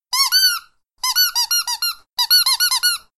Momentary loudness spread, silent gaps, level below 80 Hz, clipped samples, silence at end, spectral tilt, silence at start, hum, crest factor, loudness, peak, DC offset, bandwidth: 9 LU; none; -60 dBFS; under 0.1%; 0.2 s; 7 dB/octave; 0.1 s; none; 16 dB; -15 LUFS; -4 dBFS; under 0.1%; 16.5 kHz